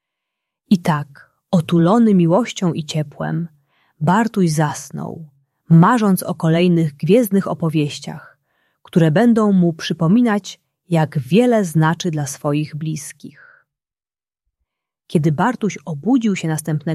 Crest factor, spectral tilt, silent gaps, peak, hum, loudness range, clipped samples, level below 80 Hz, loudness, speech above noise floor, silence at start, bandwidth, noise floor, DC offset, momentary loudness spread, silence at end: 16 dB; -6.5 dB/octave; none; -2 dBFS; none; 7 LU; under 0.1%; -60 dBFS; -17 LUFS; over 74 dB; 0.7 s; 13.5 kHz; under -90 dBFS; under 0.1%; 13 LU; 0 s